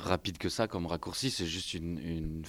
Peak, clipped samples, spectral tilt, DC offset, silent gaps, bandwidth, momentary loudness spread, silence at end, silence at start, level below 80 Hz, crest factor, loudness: -14 dBFS; under 0.1%; -4.5 dB/octave; under 0.1%; none; 16 kHz; 5 LU; 0 s; 0 s; -50 dBFS; 22 dB; -35 LUFS